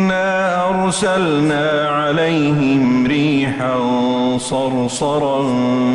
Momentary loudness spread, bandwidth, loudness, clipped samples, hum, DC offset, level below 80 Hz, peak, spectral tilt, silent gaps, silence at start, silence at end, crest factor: 3 LU; 11.5 kHz; -16 LUFS; under 0.1%; none; under 0.1%; -48 dBFS; -6 dBFS; -5.5 dB/octave; none; 0 s; 0 s; 10 dB